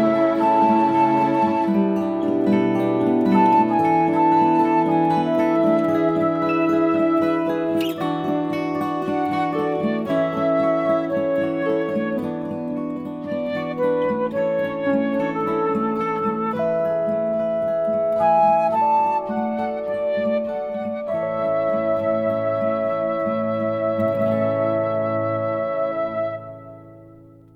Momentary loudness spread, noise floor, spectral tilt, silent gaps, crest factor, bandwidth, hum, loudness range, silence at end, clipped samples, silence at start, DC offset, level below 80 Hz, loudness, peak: 8 LU; -46 dBFS; -8 dB/octave; none; 16 dB; 13.5 kHz; none; 5 LU; 0.35 s; under 0.1%; 0 s; under 0.1%; -60 dBFS; -21 LUFS; -4 dBFS